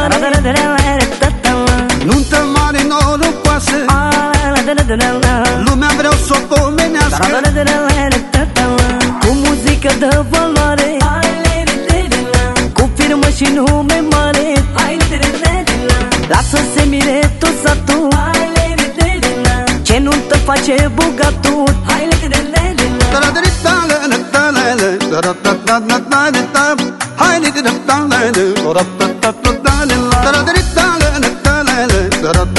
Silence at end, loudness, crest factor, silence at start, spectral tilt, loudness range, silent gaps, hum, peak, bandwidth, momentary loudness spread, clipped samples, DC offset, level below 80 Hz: 0 s; -11 LUFS; 12 dB; 0 s; -4.5 dB/octave; 1 LU; none; none; 0 dBFS; 12 kHz; 2 LU; under 0.1%; 0.2%; -18 dBFS